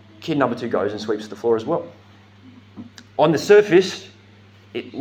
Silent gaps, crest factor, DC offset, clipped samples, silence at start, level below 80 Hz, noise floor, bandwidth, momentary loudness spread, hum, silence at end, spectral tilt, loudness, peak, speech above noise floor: none; 20 dB; under 0.1%; under 0.1%; 0.2 s; -70 dBFS; -48 dBFS; 15 kHz; 23 LU; none; 0 s; -5.5 dB/octave; -19 LUFS; -2 dBFS; 29 dB